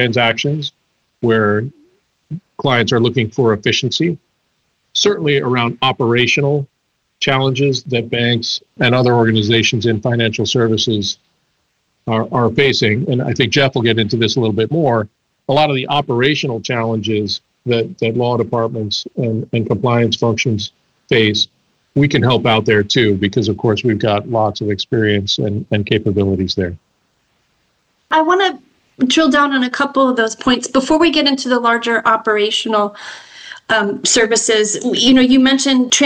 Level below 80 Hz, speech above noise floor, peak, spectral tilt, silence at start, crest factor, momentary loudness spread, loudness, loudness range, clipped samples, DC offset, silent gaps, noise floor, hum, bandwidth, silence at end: -50 dBFS; 50 dB; -2 dBFS; -4.5 dB/octave; 0 s; 14 dB; 8 LU; -15 LUFS; 3 LU; under 0.1%; under 0.1%; none; -65 dBFS; none; 10 kHz; 0 s